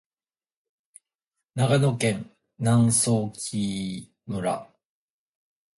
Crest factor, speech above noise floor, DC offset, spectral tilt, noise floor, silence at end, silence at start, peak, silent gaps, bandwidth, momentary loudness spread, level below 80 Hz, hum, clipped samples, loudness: 18 dB; over 66 dB; under 0.1%; -5 dB/octave; under -90 dBFS; 1.15 s; 1.55 s; -8 dBFS; none; 11.5 kHz; 15 LU; -58 dBFS; none; under 0.1%; -25 LUFS